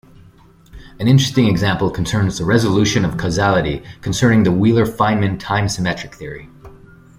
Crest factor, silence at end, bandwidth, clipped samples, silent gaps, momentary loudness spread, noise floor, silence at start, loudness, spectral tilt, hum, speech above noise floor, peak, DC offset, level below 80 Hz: 16 dB; 0.45 s; 16 kHz; under 0.1%; none; 11 LU; -46 dBFS; 0.75 s; -16 LUFS; -6 dB/octave; none; 31 dB; -2 dBFS; under 0.1%; -40 dBFS